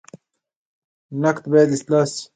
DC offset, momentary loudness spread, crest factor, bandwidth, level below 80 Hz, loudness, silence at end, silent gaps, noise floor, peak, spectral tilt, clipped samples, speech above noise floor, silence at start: under 0.1%; 6 LU; 18 dB; 9.4 kHz; -68 dBFS; -18 LUFS; 0.1 s; none; -48 dBFS; -2 dBFS; -6 dB/octave; under 0.1%; 30 dB; 1.1 s